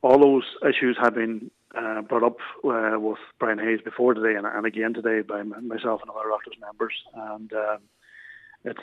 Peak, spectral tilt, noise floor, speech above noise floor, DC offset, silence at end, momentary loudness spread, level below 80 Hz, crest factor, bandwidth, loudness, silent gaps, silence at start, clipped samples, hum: -4 dBFS; -7 dB/octave; -48 dBFS; 24 dB; under 0.1%; 0 s; 15 LU; -70 dBFS; 20 dB; 5.8 kHz; -25 LUFS; none; 0.05 s; under 0.1%; none